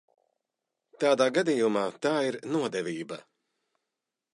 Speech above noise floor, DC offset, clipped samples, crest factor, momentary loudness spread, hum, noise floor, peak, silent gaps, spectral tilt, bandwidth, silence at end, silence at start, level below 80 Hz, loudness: 60 dB; under 0.1%; under 0.1%; 18 dB; 12 LU; none; -87 dBFS; -10 dBFS; none; -4.5 dB/octave; 11.5 kHz; 1.15 s; 1 s; -80 dBFS; -28 LUFS